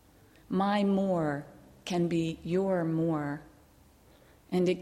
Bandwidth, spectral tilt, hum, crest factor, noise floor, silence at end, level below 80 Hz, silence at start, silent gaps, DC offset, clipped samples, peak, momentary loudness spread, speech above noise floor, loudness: 13 kHz; -7 dB/octave; none; 14 dB; -60 dBFS; 0 s; -62 dBFS; 0.5 s; none; under 0.1%; under 0.1%; -16 dBFS; 11 LU; 31 dB; -30 LUFS